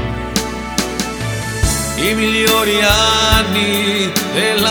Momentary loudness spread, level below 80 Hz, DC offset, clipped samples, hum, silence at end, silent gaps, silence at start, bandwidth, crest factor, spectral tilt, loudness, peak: 9 LU; -28 dBFS; under 0.1%; under 0.1%; none; 0 s; none; 0 s; over 20 kHz; 16 dB; -3 dB/octave; -14 LUFS; 0 dBFS